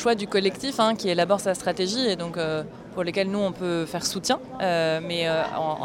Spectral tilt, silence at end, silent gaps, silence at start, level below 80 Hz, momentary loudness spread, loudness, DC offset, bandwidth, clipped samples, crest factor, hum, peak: -4 dB/octave; 0 s; none; 0 s; -58 dBFS; 5 LU; -25 LUFS; under 0.1%; 16 kHz; under 0.1%; 18 dB; none; -8 dBFS